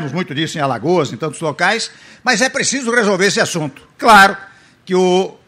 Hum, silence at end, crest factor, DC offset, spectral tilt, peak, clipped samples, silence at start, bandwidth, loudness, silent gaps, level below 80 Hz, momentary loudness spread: none; 0.15 s; 16 dB; under 0.1%; -3.5 dB/octave; 0 dBFS; under 0.1%; 0 s; 16 kHz; -14 LUFS; none; -50 dBFS; 13 LU